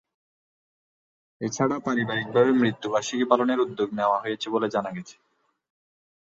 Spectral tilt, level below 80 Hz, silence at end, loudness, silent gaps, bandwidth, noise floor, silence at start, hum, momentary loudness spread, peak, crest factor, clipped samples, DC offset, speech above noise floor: -5 dB/octave; -68 dBFS; 1.25 s; -25 LUFS; none; 7.8 kHz; under -90 dBFS; 1.4 s; none; 9 LU; -6 dBFS; 20 dB; under 0.1%; under 0.1%; over 66 dB